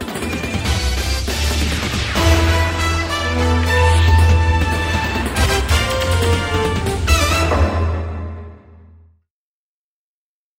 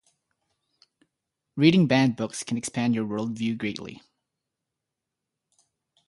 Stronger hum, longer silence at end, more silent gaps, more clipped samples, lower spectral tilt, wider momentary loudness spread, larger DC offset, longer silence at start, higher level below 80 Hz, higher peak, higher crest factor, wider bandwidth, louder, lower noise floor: neither; second, 2 s vs 2.15 s; neither; neither; about the same, -4.5 dB/octave vs -5.5 dB/octave; second, 8 LU vs 15 LU; neither; second, 0 s vs 1.55 s; first, -22 dBFS vs -66 dBFS; first, 0 dBFS vs -6 dBFS; second, 16 dB vs 22 dB; first, 16.5 kHz vs 11.5 kHz; first, -17 LUFS vs -24 LUFS; first, under -90 dBFS vs -85 dBFS